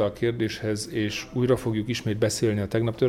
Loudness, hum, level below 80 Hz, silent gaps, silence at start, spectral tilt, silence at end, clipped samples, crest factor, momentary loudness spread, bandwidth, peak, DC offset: -26 LUFS; none; -50 dBFS; none; 0 s; -5.5 dB/octave; 0 s; under 0.1%; 16 dB; 5 LU; 16 kHz; -8 dBFS; under 0.1%